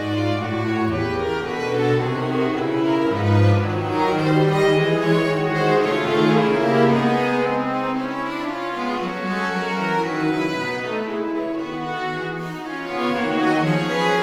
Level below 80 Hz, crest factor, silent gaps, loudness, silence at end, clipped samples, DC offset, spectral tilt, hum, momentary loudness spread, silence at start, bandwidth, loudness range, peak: -54 dBFS; 16 dB; none; -21 LUFS; 0 s; under 0.1%; under 0.1%; -7 dB/octave; none; 8 LU; 0 s; 14 kHz; 6 LU; -4 dBFS